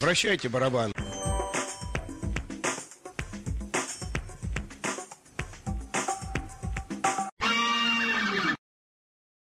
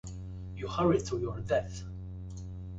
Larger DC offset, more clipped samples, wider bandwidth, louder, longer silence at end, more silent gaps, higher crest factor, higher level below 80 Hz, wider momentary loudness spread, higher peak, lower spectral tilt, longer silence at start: neither; neither; first, 15.5 kHz vs 8 kHz; first, -30 LUFS vs -34 LUFS; first, 1 s vs 0 s; first, 7.32-7.37 s vs none; about the same, 18 dB vs 18 dB; first, -42 dBFS vs -48 dBFS; about the same, 13 LU vs 15 LU; about the same, -14 dBFS vs -16 dBFS; second, -3.5 dB/octave vs -6.5 dB/octave; about the same, 0 s vs 0.05 s